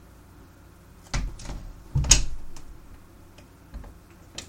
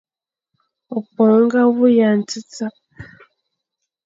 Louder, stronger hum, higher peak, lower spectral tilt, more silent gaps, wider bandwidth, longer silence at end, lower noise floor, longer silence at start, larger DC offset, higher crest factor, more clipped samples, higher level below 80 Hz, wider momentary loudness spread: second, -24 LUFS vs -15 LUFS; neither; first, 0 dBFS vs -4 dBFS; second, -2 dB/octave vs -6 dB/octave; neither; first, 16 kHz vs 7.8 kHz; second, 0 s vs 1 s; second, -50 dBFS vs -79 dBFS; second, 0.4 s vs 0.9 s; neither; first, 30 dB vs 14 dB; neither; first, -34 dBFS vs -60 dBFS; first, 27 LU vs 15 LU